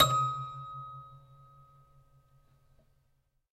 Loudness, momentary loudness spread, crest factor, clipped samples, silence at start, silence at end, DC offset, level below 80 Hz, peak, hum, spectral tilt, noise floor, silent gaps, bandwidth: -33 LUFS; 25 LU; 28 dB; under 0.1%; 0 s; 2.35 s; under 0.1%; -62 dBFS; -8 dBFS; none; -3.5 dB/octave; -73 dBFS; none; 14 kHz